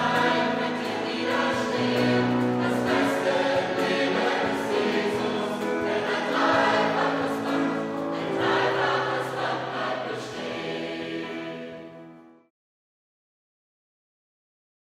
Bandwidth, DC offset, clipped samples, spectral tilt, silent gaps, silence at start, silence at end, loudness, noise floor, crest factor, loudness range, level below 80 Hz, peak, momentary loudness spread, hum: 15.5 kHz; under 0.1%; under 0.1%; -5 dB/octave; none; 0 s; 2.7 s; -25 LUFS; -48 dBFS; 18 dB; 12 LU; -64 dBFS; -8 dBFS; 10 LU; none